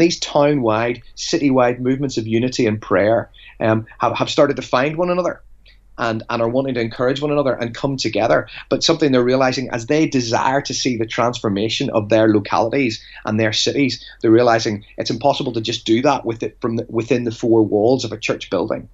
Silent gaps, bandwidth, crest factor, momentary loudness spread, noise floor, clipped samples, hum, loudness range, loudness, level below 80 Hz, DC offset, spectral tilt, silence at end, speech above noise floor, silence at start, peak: none; 8 kHz; 16 dB; 8 LU; -45 dBFS; under 0.1%; none; 2 LU; -18 LUFS; -48 dBFS; under 0.1%; -5 dB/octave; 0.05 s; 27 dB; 0 s; -2 dBFS